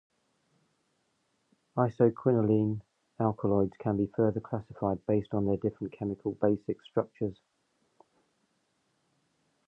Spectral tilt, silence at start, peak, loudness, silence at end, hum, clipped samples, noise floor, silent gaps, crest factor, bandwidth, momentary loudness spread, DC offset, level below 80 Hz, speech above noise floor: -11 dB/octave; 1.75 s; -10 dBFS; -31 LUFS; 2.35 s; none; under 0.1%; -76 dBFS; none; 22 dB; 5.8 kHz; 10 LU; under 0.1%; -60 dBFS; 46 dB